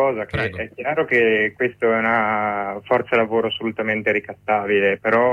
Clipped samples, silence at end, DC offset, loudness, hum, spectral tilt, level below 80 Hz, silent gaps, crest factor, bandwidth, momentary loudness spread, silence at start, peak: under 0.1%; 0 s; under 0.1%; -20 LUFS; none; -7 dB/octave; -52 dBFS; none; 14 dB; 6.8 kHz; 7 LU; 0 s; -6 dBFS